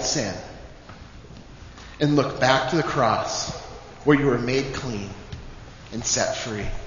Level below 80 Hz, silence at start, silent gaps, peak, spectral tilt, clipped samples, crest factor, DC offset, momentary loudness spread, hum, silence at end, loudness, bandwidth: -42 dBFS; 0 s; none; -2 dBFS; -4 dB/octave; under 0.1%; 22 dB; under 0.1%; 24 LU; none; 0 s; -23 LUFS; 7.4 kHz